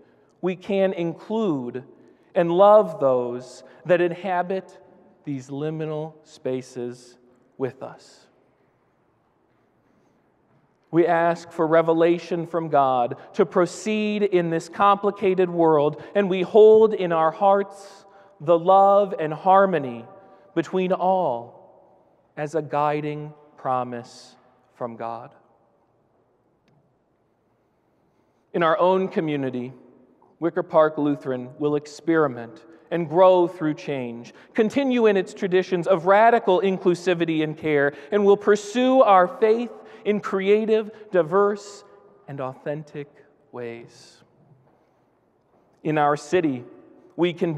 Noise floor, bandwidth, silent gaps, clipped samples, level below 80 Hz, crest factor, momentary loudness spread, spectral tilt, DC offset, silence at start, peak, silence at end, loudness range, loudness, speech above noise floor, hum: -66 dBFS; 9.8 kHz; none; under 0.1%; -74 dBFS; 18 dB; 17 LU; -6.5 dB/octave; under 0.1%; 0.45 s; -4 dBFS; 0 s; 16 LU; -21 LUFS; 45 dB; none